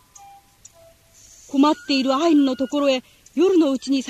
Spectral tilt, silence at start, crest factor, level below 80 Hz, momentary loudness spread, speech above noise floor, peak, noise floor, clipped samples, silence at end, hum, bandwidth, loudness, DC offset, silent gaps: -3.5 dB/octave; 1.5 s; 14 dB; -62 dBFS; 7 LU; 33 dB; -6 dBFS; -52 dBFS; under 0.1%; 0 s; none; 13 kHz; -19 LUFS; under 0.1%; none